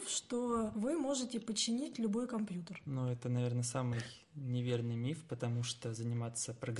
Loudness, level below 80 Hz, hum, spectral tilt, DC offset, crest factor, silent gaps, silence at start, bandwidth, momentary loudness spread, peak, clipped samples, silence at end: -38 LUFS; -70 dBFS; none; -5 dB/octave; under 0.1%; 16 dB; none; 0 s; 11.5 kHz; 5 LU; -22 dBFS; under 0.1%; 0 s